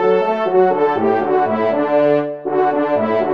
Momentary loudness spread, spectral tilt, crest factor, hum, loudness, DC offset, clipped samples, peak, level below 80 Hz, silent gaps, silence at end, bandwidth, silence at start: 3 LU; -8 dB/octave; 12 dB; none; -16 LUFS; 0.4%; under 0.1%; -2 dBFS; -66 dBFS; none; 0 s; 6 kHz; 0 s